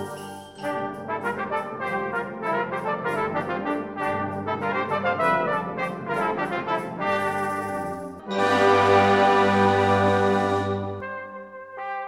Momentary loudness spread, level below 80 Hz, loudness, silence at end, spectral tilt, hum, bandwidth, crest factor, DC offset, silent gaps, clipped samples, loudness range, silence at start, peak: 15 LU; -60 dBFS; -24 LUFS; 0 s; -6 dB/octave; none; 15.5 kHz; 18 dB; under 0.1%; none; under 0.1%; 7 LU; 0 s; -6 dBFS